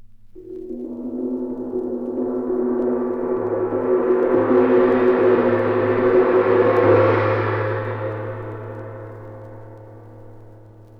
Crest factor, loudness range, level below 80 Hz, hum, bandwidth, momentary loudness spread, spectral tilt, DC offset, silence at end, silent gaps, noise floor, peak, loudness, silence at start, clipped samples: 16 dB; 9 LU; -50 dBFS; none; 5.4 kHz; 19 LU; -10 dB/octave; under 0.1%; 0.15 s; none; -43 dBFS; -4 dBFS; -19 LUFS; 0 s; under 0.1%